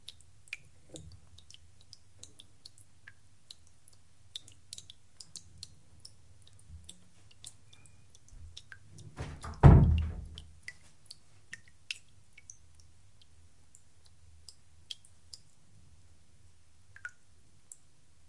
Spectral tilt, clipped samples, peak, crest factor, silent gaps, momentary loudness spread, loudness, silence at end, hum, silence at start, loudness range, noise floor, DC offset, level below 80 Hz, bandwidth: -7 dB/octave; under 0.1%; -4 dBFS; 30 dB; none; 21 LU; -28 LUFS; 8.05 s; none; 9.2 s; 25 LU; -66 dBFS; 0.2%; -42 dBFS; 11.5 kHz